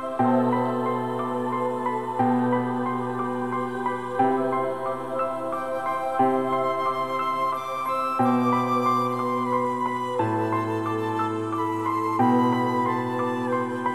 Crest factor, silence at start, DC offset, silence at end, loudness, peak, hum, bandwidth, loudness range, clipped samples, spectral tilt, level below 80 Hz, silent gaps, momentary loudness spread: 16 dB; 0 s; 0.4%; 0 s; -25 LUFS; -10 dBFS; none; 14.5 kHz; 2 LU; under 0.1%; -7 dB/octave; -74 dBFS; none; 6 LU